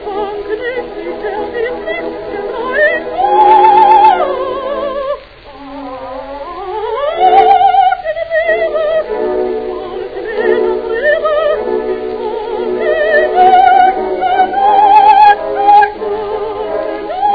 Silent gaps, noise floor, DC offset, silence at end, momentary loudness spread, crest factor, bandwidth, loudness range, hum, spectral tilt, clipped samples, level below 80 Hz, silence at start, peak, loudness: none; -33 dBFS; 0.2%; 0 s; 15 LU; 12 dB; 5.4 kHz; 6 LU; none; -6.5 dB/octave; 0.4%; -42 dBFS; 0 s; 0 dBFS; -11 LUFS